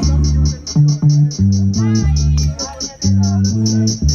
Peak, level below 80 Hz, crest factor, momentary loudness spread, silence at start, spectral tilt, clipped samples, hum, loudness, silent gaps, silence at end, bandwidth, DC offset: -2 dBFS; -20 dBFS; 10 dB; 5 LU; 0 s; -6 dB/octave; under 0.1%; none; -15 LUFS; none; 0 s; 7.2 kHz; under 0.1%